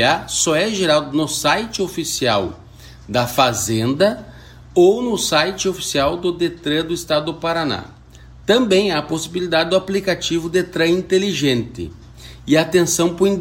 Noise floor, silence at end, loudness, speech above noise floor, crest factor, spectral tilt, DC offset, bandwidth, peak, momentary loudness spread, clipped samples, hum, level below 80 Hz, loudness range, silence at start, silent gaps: -42 dBFS; 0 s; -18 LUFS; 24 dB; 18 dB; -4 dB/octave; under 0.1%; 16.5 kHz; 0 dBFS; 8 LU; under 0.1%; none; -44 dBFS; 2 LU; 0 s; none